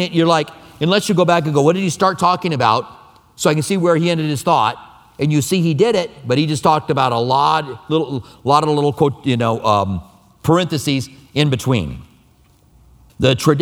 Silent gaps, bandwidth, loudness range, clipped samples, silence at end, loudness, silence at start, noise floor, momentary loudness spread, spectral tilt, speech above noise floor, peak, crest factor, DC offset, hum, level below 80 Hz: none; 17.5 kHz; 3 LU; under 0.1%; 0 s; -17 LUFS; 0 s; -52 dBFS; 8 LU; -5.5 dB/octave; 36 dB; 0 dBFS; 16 dB; under 0.1%; none; -48 dBFS